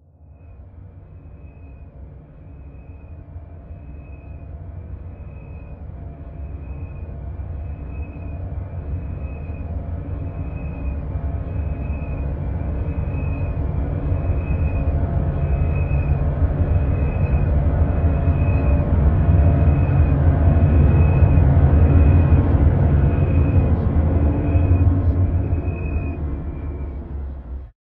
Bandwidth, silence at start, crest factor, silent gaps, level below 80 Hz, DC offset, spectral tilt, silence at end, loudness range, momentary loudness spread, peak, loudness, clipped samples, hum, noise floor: 3.4 kHz; 0.4 s; 16 dB; none; -22 dBFS; under 0.1%; -13 dB/octave; 0.2 s; 21 LU; 21 LU; -2 dBFS; -20 LUFS; under 0.1%; none; -45 dBFS